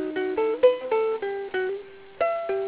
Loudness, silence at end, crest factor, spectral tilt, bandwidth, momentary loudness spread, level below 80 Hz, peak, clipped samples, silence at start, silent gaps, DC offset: -25 LUFS; 0 s; 18 dB; -8 dB/octave; 4 kHz; 10 LU; -66 dBFS; -8 dBFS; under 0.1%; 0 s; none; under 0.1%